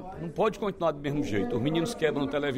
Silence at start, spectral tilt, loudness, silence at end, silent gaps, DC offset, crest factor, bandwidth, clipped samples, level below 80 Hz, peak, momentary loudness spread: 0 s; -6 dB/octave; -29 LUFS; 0 s; none; under 0.1%; 16 dB; 16 kHz; under 0.1%; -50 dBFS; -14 dBFS; 2 LU